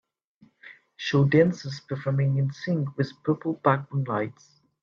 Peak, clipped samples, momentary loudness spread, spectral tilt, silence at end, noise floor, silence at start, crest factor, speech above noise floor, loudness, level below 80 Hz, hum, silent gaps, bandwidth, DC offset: -6 dBFS; under 0.1%; 12 LU; -7.5 dB/octave; 0.5 s; -51 dBFS; 0.65 s; 20 dB; 26 dB; -26 LUFS; -68 dBFS; none; none; 7.2 kHz; under 0.1%